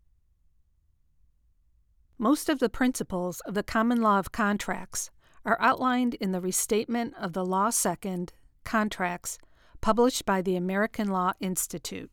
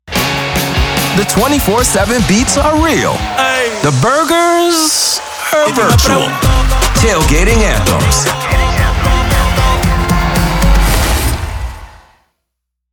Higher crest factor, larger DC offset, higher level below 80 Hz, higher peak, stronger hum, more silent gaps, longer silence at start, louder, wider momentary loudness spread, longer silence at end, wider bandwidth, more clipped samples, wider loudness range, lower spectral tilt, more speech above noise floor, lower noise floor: first, 20 dB vs 10 dB; neither; second, -52 dBFS vs -16 dBFS; second, -10 dBFS vs 0 dBFS; neither; neither; first, 2.2 s vs 0.05 s; second, -28 LUFS vs -11 LUFS; first, 10 LU vs 4 LU; second, 0.05 s vs 0.95 s; about the same, 20 kHz vs over 20 kHz; neither; about the same, 3 LU vs 2 LU; about the same, -4 dB/octave vs -4 dB/octave; second, 39 dB vs 64 dB; second, -66 dBFS vs -74 dBFS